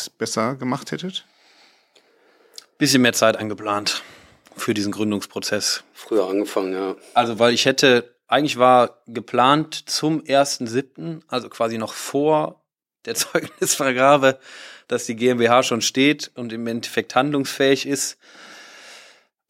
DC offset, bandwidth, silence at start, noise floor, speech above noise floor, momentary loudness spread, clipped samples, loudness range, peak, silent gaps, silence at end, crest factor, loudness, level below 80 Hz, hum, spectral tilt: under 0.1%; 16.5 kHz; 0 s; -58 dBFS; 38 dB; 13 LU; under 0.1%; 6 LU; -2 dBFS; none; 0.5 s; 20 dB; -20 LUFS; -72 dBFS; none; -3.5 dB/octave